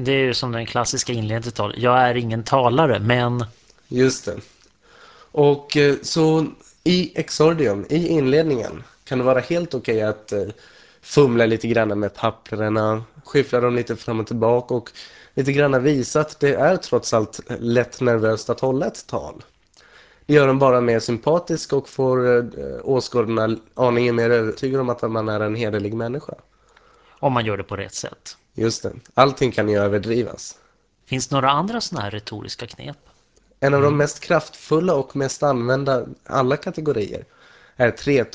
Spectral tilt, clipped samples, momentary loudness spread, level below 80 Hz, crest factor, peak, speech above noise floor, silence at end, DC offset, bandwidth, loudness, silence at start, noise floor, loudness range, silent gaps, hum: -5.5 dB/octave; under 0.1%; 12 LU; -50 dBFS; 20 dB; 0 dBFS; 39 dB; 0.05 s; under 0.1%; 8 kHz; -20 LUFS; 0 s; -58 dBFS; 4 LU; none; none